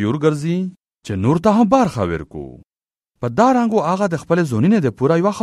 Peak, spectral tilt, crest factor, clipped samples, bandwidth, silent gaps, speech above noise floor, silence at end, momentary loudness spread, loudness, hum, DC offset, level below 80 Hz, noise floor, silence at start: 0 dBFS; -7.5 dB/octave; 18 dB; under 0.1%; 12.5 kHz; none; 70 dB; 0 s; 13 LU; -17 LUFS; none; under 0.1%; -48 dBFS; -86 dBFS; 0 s